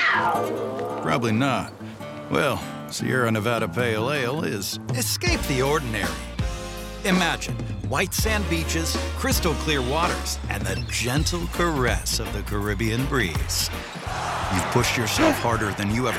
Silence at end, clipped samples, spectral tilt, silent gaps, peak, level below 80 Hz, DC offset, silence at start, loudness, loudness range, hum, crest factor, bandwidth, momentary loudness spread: 0 s; under 0.1%; -4 dB/octave; none; -6 dBFS; -34 dBFS; under 0.1%; 0 s; -24 LUFS; 2 LU; none; 18 dB; 16.5 kHz; 8 LU